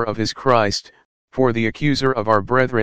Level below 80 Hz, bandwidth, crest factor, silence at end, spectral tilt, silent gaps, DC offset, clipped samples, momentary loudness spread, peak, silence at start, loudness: -46 dBFS; 9.6 kHz; 18 dB; 0 s; -5.5 dB/octave; 1.05-1.28 s; 2%; under 0.1%; 6 LU; 0 dBFS; 0 s; -19 LUFS